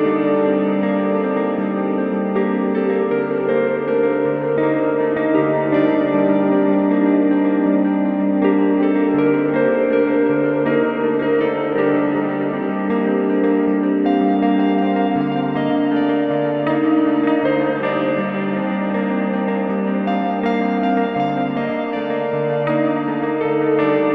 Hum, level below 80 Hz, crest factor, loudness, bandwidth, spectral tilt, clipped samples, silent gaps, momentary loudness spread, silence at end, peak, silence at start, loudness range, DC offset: none; -60 dBFS; 14 dB; -18 LUFS; 4.5 kHz; -10 dB/octave; under 0.1%; none; 4 LU; 0 s; -4 dBFS; 0 s; 3 LU; under 0.1%